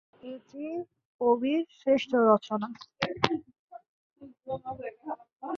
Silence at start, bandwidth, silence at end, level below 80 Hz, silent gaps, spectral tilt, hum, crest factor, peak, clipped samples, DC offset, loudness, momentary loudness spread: 0.25 s; 7.2 kHz; 0 s; -68 dBFS; 1.05-1.19 s, 3.59-3.68 s, 3.88-4.16 s, 5.36-5.40 s; -6 dB/octave; none; 28 dB; -4 dBFS; under 0.1%; under 0.1%; -29 LUFS; 19 LU